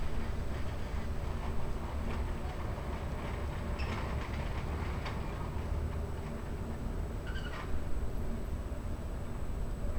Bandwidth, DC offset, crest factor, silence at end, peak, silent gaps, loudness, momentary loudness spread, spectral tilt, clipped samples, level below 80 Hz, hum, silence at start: over 20 kHz; under 0.1%; 14 dB; 0 s; -22 dBFS; none; -39 LUFS; 3 LU; -6.5 dB/octave; under 0.1%; -38 dBFS; none; 0 s